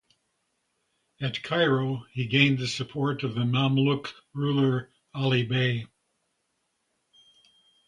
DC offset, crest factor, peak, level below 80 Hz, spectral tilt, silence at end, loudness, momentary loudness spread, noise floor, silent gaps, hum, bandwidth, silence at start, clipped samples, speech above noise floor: under 0.1%; 22 dB; -6 dBFS; -64 dBFS; -6.5 dB/octave; 2 s; -26 LUFS; 10 LU; -76 dBFS; none; none; 10.5 kHz; 1.2 s; under 0.1%; 51 dB